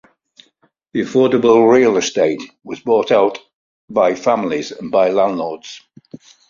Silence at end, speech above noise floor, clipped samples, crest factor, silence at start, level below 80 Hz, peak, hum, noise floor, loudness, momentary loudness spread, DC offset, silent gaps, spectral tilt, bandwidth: 0.35 s; 44 dB; under 0.1%; 16 dB; 0.95 s; -60 dBFS; 0 dBFS; none; -59 dBFS; -15 LUFS; 16 LU; under 0.1%; 3.54-3.88 s; -5 dB/octave; 7.6 kHz